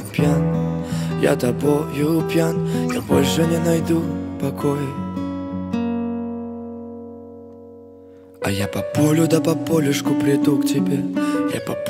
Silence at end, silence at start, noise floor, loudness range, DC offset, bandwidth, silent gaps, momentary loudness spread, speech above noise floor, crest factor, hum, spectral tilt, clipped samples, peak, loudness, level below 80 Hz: 0 s; 0 s; -43 dBFS; 9 LU; under 0.1%; 16 kHz; none; 13 LU; 24 dB; 18 dB; none; -6.5 dB/octave; under 0.1%; -2 dBFS; -20 LUFS; -50 dBFS